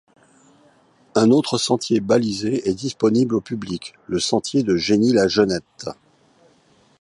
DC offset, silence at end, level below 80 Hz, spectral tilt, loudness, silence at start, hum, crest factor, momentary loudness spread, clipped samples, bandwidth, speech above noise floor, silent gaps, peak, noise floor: under 0.1%; 1.1 s; -54 dBFS; -5 dB/octave; -20 LUFS; 1.15 s; none; 18 dB; 12 LU; under 0.1%; 11.5 kHz; 38 dB; none; -2 dBFS; -57 dBFS